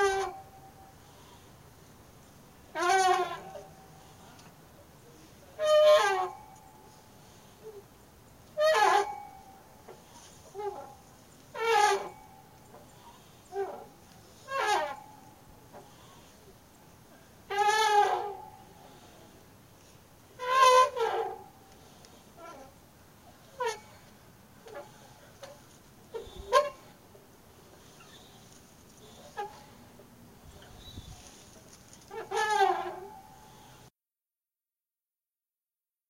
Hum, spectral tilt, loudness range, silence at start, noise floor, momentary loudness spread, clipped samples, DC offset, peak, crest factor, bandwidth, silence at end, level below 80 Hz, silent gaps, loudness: none; -2 dB/octave; 15 LU; 0 s; under -90 dBFS; 28 LU; under 0.1%; under 0.1%; -10 dBFS; 24 dB; 16 kHz; 2.9 s; -64 dBFS; none; -28 LUFS